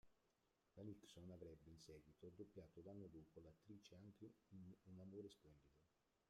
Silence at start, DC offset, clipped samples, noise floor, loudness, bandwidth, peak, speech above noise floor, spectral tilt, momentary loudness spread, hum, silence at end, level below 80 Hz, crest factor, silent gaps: 0.05 s; under 0.1%; under 0.1%; -86 dBFS; -63 LUFS; 13 kHz; -46 dBFS; 24 dB; -6.5 dB/octave; 6 LU; none; 0.35 s; -82 dBFS; 16 dB; none